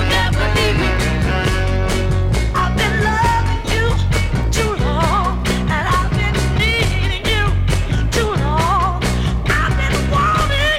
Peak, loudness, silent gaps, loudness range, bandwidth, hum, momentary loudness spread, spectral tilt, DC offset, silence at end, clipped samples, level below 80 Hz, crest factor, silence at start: -4 dBFS; -17 LUFS; none; 0 LU; 16 kHz; none; 3 LU; -5 dB/octave; under 0.1%; 0 s; under 0.1%; -20 dBFS; 12 dB; 0 s